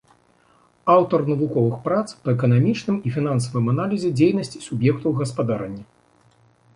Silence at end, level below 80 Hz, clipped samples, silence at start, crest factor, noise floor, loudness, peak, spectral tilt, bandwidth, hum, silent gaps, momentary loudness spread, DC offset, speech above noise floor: 0.95 s; -58 dBFS; under 0.1%; 0.85 s; 18 dB; -58 dBFS; -21 LUFS; -4 dBFS; -7.5 dB/octave; 11 kHz; none; none; 9 LU; under 0.1%; 38 dB